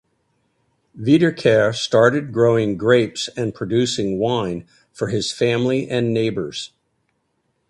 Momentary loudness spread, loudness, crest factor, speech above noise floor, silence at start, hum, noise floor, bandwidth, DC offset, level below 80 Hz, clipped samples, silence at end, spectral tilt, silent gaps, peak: 11 LU; -19 LUFS; 18 dB; 51 dB; 0.95 s; none; -69 dBFS; 11.5 kHz; under 0.1%; -54 dBFS; under 0.1%; 1.05 s; -5.5 dB/octave; none; 0 dBFS